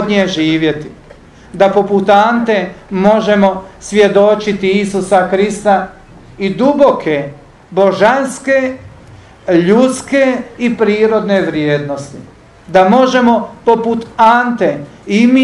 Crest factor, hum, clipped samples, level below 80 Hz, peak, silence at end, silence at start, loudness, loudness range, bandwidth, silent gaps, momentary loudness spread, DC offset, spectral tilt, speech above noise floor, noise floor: 12 dB; none; 0.3%; -46 dBFS; 0 dBFS; 0 s; 0 s; -12 LUFS; 2 LU; 11.5 kHz; none; 11 LU; under 0.1%; -5.5 dB/octave; 27 dB; -38 dBFS